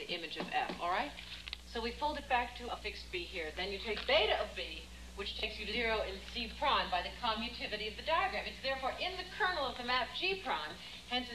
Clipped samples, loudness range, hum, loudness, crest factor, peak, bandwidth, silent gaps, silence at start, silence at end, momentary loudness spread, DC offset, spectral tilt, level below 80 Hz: under 0.1%; 3 LU; 60 Hz at -50 dBFS; -36 LUFS; 20 dB; -18 dBFS; 14.5 kHz; none; 0 s; 0 s; 9 LU; under 0.1%; -3.5 dB/octave; -54 dBFS